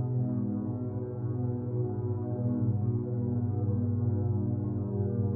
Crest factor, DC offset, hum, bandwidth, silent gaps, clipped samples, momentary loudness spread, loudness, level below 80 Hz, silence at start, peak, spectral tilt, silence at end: 12 dB; under 0.1%; none; 1.7 kHz; none; under 0.1%; 4 LU; -31 LUFS; -56 dBFS; 0 s; -18 dBFS; -15.5 dB/octave; 0 s